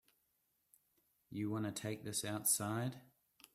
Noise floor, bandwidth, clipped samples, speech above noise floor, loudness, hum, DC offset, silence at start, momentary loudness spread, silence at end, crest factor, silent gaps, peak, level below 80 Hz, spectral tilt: -82 dBFS; 16 kHz; under 0.1%; 42 dB; -39 LUFS; none; under 0.1%; 1.3 s; 11 LU; 0.5 s; 22 dB; none; -20 dBFS; -78 dBFS; -3.5 dB/octave